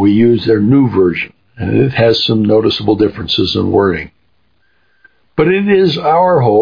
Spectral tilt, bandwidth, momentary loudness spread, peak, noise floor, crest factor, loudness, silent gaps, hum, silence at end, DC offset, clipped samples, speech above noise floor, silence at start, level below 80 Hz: -8 dB/octave; 5.2 kHz; 10 LU; 0 dBFS; -59 dBFS; 12 dB; -12 LUFS; none; none; 0 s; under 0.1%; under 0.1%; 49 dB; 0 s; -42 dBFS